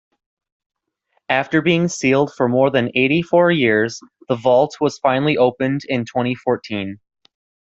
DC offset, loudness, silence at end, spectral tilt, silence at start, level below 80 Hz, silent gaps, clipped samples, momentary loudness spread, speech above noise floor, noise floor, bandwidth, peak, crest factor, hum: under 0.1%; -18 LUFS; 0.8 s; -5.5 dB/octave; 1.3 s; -58 dBFS; none; under 0.1%; 8 LU; 51 dB; -68 dBFS; 8 kHz; -2 dBFS; 16 dB; none